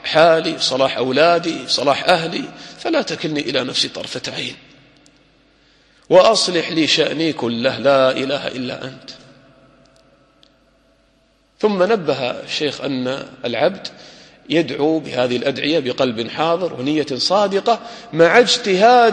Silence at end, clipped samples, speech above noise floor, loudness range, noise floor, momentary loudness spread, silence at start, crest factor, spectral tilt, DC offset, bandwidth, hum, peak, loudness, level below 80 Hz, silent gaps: 0 s; under 0.1%; 41 dB; 7 LU; -58 dBFS; 13 LU; 0.05 s; 18 dB; -4 dB/octave; under 0.1%; 11 kHz; none; 0 dBFS; -17 LUFS; -60 dBFS; none